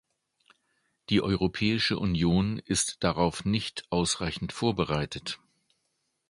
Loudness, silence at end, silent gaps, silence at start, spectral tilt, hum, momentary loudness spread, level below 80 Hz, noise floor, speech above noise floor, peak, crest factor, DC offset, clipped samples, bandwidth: -28 LUFS; 0.95 s; none; 1.1 s; -4.5 dB/octave; none; 8 LU; -48 dBFS; -78 dBFS; 50 dB; -8 dBFS; 20 dB; under 0.1%; under 0.1%; 11.5 kHz